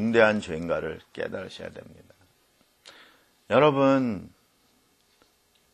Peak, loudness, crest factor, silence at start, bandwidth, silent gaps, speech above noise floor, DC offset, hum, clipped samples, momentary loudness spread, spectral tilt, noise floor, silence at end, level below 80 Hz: -4 dBFS; -25 LUFS; 24 dB; 0 s; 11.5 kHz; none; 41 dB; under 0.1%; none; under 0.1%; 19 LU; -6.5 dB/octave; -65 dBFS; 1.45 s; -60 dBFS